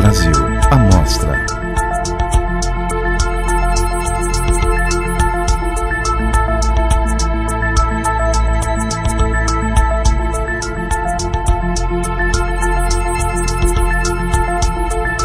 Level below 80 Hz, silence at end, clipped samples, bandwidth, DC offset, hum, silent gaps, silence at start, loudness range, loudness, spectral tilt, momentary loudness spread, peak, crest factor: -16 dBFS; 0 s; under 0.1%; 14.5 kHz; under 0.1%; none; none; 0 s; 2 LU; -16 LUFS; -5 dB/octave; 5 LU; 0 dBFS; 14 dB